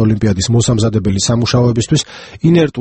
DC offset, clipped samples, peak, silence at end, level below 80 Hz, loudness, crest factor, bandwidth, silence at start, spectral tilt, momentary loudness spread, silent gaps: under 0.1%; under 0.1%; 0 dBFS; 0 s; -36 dBFS; -13 LUFS; 12 dB; 8.6 kHz; 0 s; -5.5 dB/octave; 4 LU; none